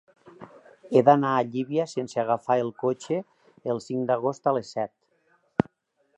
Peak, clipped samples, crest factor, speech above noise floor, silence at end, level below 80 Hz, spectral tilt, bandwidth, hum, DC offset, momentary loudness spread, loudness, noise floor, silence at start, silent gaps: -4 dBFS; under 0.1%; 22 dB; 46 dB; 0.55 s; -64 dBFS; -7 dB/octave; 9.4 kHz; none; under 0.1%; 12 LU; -26 LUFS; -71 dBFS; 0.4 s; none